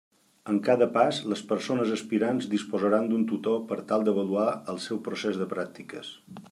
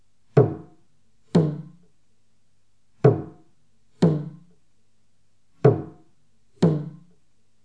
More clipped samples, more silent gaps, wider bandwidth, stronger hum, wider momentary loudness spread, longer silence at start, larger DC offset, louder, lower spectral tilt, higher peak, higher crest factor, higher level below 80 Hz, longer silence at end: neither; neither; first, 12 kHz vs 9.2 kHz; neither; second, 14 LU vs 19 LU; about the same, 0.45 s vs 0.35 s; second, under 0.1% vs 0.2%; second, -27 LUFS vs -23 LUFS; second, -6 dB/octave vs -9.5 dB/octave; second, -8 dBFS vs -2 dBFS; second, 18 dB vs 24 dB; second, -78 dBFS vs -64 dBFS; second, 0.05 s vs 0.75 s